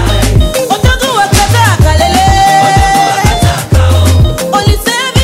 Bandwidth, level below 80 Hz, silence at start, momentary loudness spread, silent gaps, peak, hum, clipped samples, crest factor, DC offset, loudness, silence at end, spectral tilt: 16.5 kHz; -14 dBFS; 0 s; 4 LU; none; 0 dBFS; none; 0.3%; 8 dB; under 0.1%; -8 LUFS; 0 s; -4.5 dB/octave